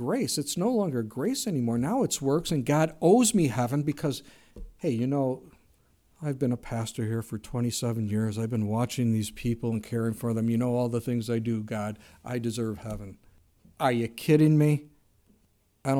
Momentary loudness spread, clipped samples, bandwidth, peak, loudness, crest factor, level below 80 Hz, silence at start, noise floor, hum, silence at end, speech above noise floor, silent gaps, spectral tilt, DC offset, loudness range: 12 LU; under 0.1%; 17.5 kHz; -8 dBFS; -28 LUFS; 18 dB; -54 dBFS; 0 s; -67 dBFS; none; 0 s; 40 dB; none; -6 dB/octave; under 0.1%; 6 LU